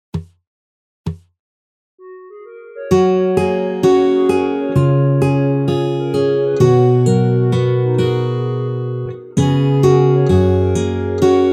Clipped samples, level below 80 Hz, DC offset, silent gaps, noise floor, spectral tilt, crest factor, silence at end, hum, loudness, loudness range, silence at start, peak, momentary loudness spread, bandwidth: under 0.1%; -44 dBFS; under 0.1%; 0.47-1.04 s, 1.39-1.98 s; -36 dBFS; -8 dB/octave; 14 dB; 0 s; none; -15 LUFS; 5 LU; 0.15 s; -2 dBFS; 11 LU; 11.5 kHz